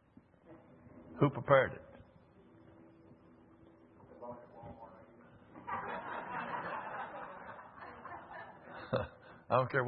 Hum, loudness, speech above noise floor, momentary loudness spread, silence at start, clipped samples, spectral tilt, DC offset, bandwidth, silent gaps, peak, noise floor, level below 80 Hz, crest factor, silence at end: none; -36 LUFS; 32 dB; 27 LU; 0.45 s; under 0.1%; -5.5 dB/octave; under 0.1%; 5.2 kHz; none; -12 dBFS; -63 dBFS; -70 dBFS; 28 dB; 0 s